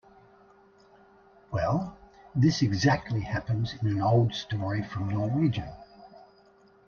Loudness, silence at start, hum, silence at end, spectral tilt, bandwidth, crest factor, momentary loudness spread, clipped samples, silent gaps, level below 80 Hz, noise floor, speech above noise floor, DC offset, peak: -28 LUFS; 1.5 s; none; 0.7 s; -6.5 dB/octave; 7 kHz; 18 dB; 11 LU; under 0.1%; none; -54 dBFS; -59 dBFS; 33 dB; under 0.1%; -12 dBFS